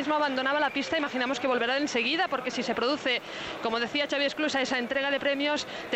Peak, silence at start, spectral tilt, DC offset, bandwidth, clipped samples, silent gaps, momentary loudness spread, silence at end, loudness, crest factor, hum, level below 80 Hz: -14 dBFS; 0 s; -2.5 dB/octave; under 0.1%; 15 kHz; under 0.1%; none; 4 LU; 0 s; -28 LUFS; 16 dB; none; -66 dBFS